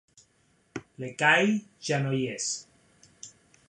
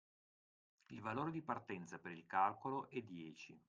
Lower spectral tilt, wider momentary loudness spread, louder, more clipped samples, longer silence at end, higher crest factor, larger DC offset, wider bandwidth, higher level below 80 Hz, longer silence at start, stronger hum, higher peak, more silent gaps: second, -4 dB/octave vs -6.5 dB/octave; first, 25 LU vs 15 LU; first, -26 LUFS vs -45 LUFS; neither; first, 0.4 s vs 0.1 s; about the same, 22 dB vs 22 dB; neither; first, 11 kHz vs 9.2 kHz; first, -72 dBFS vs -84 dBFS; second, 0.75 s vs 0.9 s; neither; first, -8 dBFS vs -24 dBFS; neither